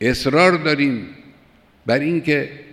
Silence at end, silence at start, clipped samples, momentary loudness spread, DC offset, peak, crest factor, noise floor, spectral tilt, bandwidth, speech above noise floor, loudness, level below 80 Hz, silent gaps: 0.1 s; 0 s; under 0.1%; 14 LU; under 0.1%; -2 dBFS; 18 dB; -52 dBFS; -5.5 dB/octave; 14.5 kHz; 34 dB; -18 LUFS; -46 dBFS; none